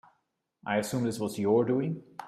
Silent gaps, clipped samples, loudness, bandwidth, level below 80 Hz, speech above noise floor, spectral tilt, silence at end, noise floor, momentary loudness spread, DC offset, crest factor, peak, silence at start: none; under 0.1%; -29 LUFS; 15 kHz; -70 dBFS; 49 dB; -6 dB/octave; 0 s; -77 dBFS; 8 LU; under 0.1%; 16 dB; -14 dBFS; 0.65 s